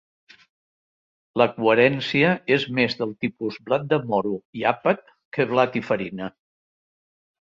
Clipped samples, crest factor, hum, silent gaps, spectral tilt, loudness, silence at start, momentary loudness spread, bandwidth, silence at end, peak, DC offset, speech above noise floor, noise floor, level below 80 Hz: under 0.1%; 20 dB; none; 4.45-4.53 s, 5.25-5.32 s; -7 dB/octave; -22 LUFS; 1.35 s; 12 LU; 7.4 kHz; 1.2 s; -4 dBFS; under 0.1%; over 68 dB; under -90 dBFS; -64 dBFS